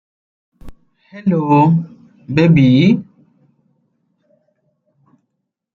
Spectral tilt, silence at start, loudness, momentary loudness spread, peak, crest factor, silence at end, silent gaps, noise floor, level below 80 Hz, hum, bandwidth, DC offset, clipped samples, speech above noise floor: -9 dB/octave; 0.65 s; -13 LUFS; 11 LU; -2 dBFS; 16 dB; 2.7 s; none; -74 dBFS; -48 dBFS; none; 6.6 kHz; under 0.1%; under 0.1%; 62 dB